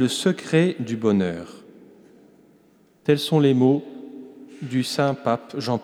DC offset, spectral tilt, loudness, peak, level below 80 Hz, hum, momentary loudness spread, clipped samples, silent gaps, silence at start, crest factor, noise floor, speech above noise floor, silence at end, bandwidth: under 0.1%; -6 dB/octave; -22 LUFS; -6 dBFS; -68 dBFS; none; 21 LU; under 0.1%; none; 0 s; 16 dB; -57 dBFS; 36 dB; 0 s; 15.5 kHz